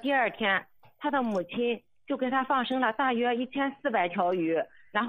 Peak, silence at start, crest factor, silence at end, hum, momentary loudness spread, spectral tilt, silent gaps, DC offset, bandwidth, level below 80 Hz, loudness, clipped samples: -12 dBFS; 0 s; 16 dB; 0 s; none; 6 LU; -6.5 dB/octave; none; under 0.1%; 14.5 kHz; -74 dBFS; -29 LUFS; under 0.1%